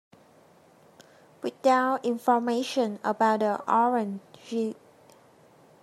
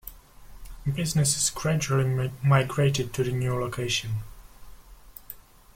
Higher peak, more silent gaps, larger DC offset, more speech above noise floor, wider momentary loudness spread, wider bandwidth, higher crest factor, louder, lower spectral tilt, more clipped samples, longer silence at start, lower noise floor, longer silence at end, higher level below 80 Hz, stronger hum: about the same, -10 dBFS vs -8 dBFS; neither; neither; first, 32 dB vs 23 dB; second, 13 LU vs 20 LU; second, 14 kHz vs 16.5 kHz; about the same, 18 dB vs 18 dB; about the same, -26 LUFS vs -26 LUFS; about the same, -5 dB/octave vs -4.5 dB/octave; neither; first, 1.4 s vs 0.05 s; first, -57 dBFS vs -48 dBFS; first, 1.1 s vs 0.35 s; second, -82 dBFS vs -48 dBFS; neither